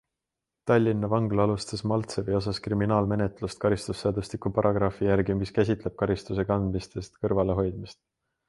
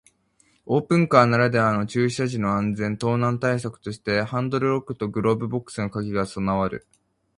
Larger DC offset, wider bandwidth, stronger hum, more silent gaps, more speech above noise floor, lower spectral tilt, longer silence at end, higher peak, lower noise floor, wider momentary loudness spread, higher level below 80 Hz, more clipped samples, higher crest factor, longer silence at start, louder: neither; about the same, 11.5 kHz vs 11 kHz; neither; neither; first, 61 dB vs 41 dB; about the same, -7 dB/octave vs -7 dB/octave; about the same, 0.55 s vs 0.6 s; second, -8 dBFS vs 0 dBFS; first, -87 dBFS vs -63 dBFS; second, 7 LU vs 11 LU; first, -46 dBFS vs -52 dBFS; neither; about the same, 18 dB vs 22 dB; about the same, 0.65 s vs 0.65 s; second, -27 LUFS vs -23 LUFS